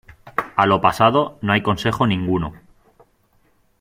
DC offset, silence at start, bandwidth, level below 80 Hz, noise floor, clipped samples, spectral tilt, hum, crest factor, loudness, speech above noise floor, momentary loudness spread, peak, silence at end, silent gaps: under 0.1%; 0.25 s; 16 kHz; -48 dBFS; -60 dBFS; under 0.1%; -6.5 dB/octave; none; 18 dB; -19 LUFS; 42 dB; 11 LU; -2 dBFS; 1.25 s; none